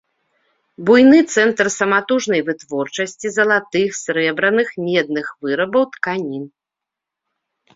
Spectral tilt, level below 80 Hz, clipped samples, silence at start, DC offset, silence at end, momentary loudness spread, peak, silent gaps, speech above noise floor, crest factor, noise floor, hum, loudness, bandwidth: -4 dB/octave; -62 dBFS; under 0.1%; 0.8 s; under 0.1%; 1.3 s; 12 LU; -2 dBFS; none; 68 dB; 16 dB; -84 dBFS; none; -17 LUFS; 7.8 kHz